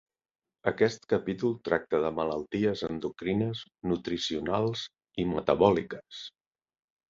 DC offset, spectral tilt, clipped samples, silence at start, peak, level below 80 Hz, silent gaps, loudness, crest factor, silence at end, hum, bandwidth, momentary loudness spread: under 0.1%; -6 dB/octave; under 0.1%; 0.65 s; -8 dBFS; -58 dBFS; none; -30 LUFS; 22 dB; 0.8 s; none; 7.6 kHz; 13 LU